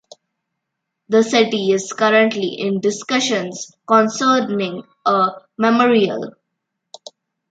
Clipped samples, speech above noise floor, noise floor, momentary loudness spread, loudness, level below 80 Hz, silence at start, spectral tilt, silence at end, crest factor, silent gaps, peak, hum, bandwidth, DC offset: under 0.1%; 61 dB; -78 dBFS; 9 LU; -17 LUFS; -70 dBFS; 1.1 s; -4 dB/octave; 1.2 s; 16 dB; none; -2 dBFS; none; 9.2 kHz; under 0.1%